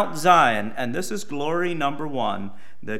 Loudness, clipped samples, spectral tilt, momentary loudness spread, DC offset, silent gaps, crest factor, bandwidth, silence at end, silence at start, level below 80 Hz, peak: -22 LUFS; under 0.1%; -4.5 dB/octave; 15 LU; 3%; none; 22 dB; 16 kHz; 0 s; 0 s; -64 dBFS; -2 dBFS